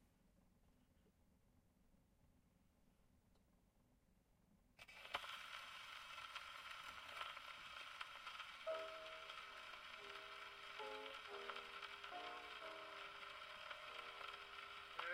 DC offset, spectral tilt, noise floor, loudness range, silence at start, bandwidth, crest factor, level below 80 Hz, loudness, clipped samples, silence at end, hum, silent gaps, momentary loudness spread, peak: under 0.1%; -1.5 dB/octave; -77 dBFS; 4 LU; 0 s; 16 kHz; 26 dB; -80 dBFS; -53 LUFS; under 0.1%; 0 s; none; none; 5 LU; -30 dBFS